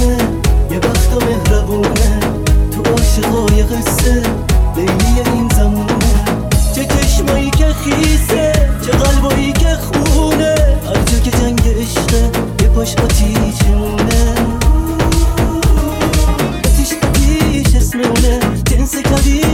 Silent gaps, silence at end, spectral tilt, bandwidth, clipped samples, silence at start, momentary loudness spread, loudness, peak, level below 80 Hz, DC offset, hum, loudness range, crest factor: none; 0 s; -5 dB/octave; 16.5 kHz; under 0.1%; 0 s; 2 LU; -13 LUFS; 0 dBFS; -14 dBFS; under 0.1%; none; 1 LU; 12 dB